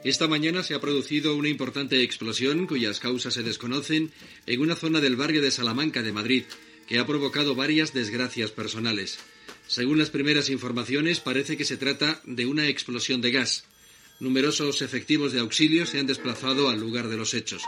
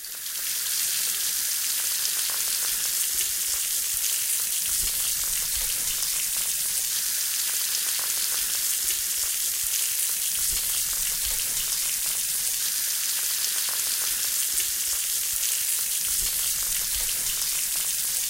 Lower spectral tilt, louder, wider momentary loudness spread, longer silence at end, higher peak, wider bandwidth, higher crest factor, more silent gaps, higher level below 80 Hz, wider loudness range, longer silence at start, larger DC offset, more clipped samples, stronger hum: first, -3.5 dB/octave vs 2.5 dB/octave; about the same, -25 LUFS vs -23 LUFS; first, 6 LU vs 1 LU; about the same, 0 s vs 0 s; about the same, -4 dBFS vs -6 dBFS; second, 14 kHz vs 17 kHz; about the same, 22 dB vs 20 dB; neither; second, -70 dBFS vs -50 dBFS; about the same, 2 LU vs 0 LU; about the same, 0 s vs 0 s; neither; neither; neither